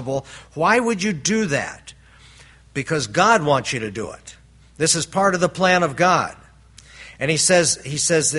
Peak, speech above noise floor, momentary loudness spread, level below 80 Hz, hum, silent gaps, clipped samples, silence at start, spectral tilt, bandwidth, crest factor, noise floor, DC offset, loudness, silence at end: -2 dBFS; 28 dB; 15 LU; -52 dBFS; none; none; under 0.1%; 0 s; -3 dB/octave; 11.5 kHz; 20 dB; -47 dBFS; under 0.1%; -19 LUFS; 0 s